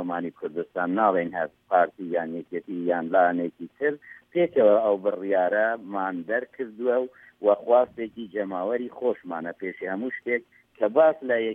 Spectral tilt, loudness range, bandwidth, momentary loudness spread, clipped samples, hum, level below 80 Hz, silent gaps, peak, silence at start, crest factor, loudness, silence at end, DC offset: -8.5 dB/octave; 3 LU; 3.8 kHz; 12 LU; under 0.1%; none; -74 dBFS; none; -6 dBFS; 0 s; 18 dB; -25 LUFS; 0 s; under 0.1%